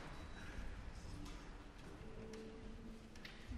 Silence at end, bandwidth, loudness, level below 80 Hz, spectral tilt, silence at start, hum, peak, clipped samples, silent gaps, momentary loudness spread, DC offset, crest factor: 0 s; 13.5 kHz; -55 LUFS; -54 dBFS; -5.5 dB/octave; 0 s; none; -38 dBFS; under 0.1%; none; 4 LU; under 0.1%; 14 dB